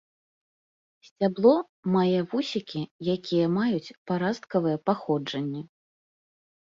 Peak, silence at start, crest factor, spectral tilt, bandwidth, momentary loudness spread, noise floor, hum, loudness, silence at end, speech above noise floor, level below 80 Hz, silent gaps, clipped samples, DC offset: -8 dBFS; 1.2 s; 20 dB; -7.5 dB/octave; 7.6 kHz; 10 LU; under -90 dBFS; none; -26 LUFS; 1 s; over 64 dB; -70 dBFS; 1.69-1.83 s, 2.91-2.99 s, 3.97-4.06 s; under 0.1%; under 0.1%